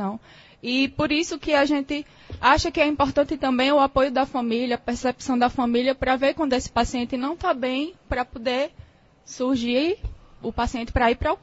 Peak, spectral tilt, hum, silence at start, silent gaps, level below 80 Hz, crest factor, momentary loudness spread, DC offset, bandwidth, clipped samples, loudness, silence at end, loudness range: -4 dBFS; -4.5 dB/octave; none; 0 s; none; -40 dBFS; 20 dB; 11 LU; under 0.1%; 8 kHz; under 0.1%; -23 LUFS; 0.05 s; 5 LU